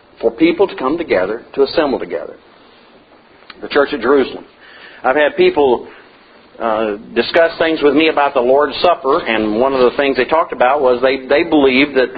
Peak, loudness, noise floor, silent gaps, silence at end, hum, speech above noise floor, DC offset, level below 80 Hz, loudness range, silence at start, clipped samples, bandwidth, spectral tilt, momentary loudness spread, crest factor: 0 dBFS; -14 LUFS; -45 dBFS; none; 0 s; none; 32 dB; under 0.1%; -48 dBFS; 6 LU; 0.2 s; under 0.1%; 5 kHz; -7.5 dB/octave; 9 LU; 14 dB